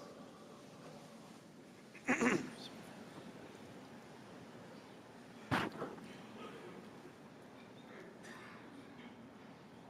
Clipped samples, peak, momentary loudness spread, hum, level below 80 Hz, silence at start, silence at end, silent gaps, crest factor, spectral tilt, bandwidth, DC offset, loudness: under 0.1%; -20 dBFS; 18 LU; none; -78 dBFS; 0 s; 0 s; none; 28 dB; -4.5 dB/octave; 15.5 kHz; under 0.1%; -45 LUFS